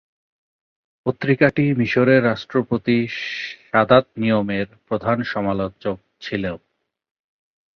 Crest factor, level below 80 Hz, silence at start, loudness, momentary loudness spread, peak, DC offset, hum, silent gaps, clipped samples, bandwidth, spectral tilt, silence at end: 20 dB; -52 dBFS; 1.05 s; -20 LUFS; 13 LU; 0 dBFS; under 0.1%; none; none; under 0.1%; 6.6 kHz; -8 dB/octave; 1.2 s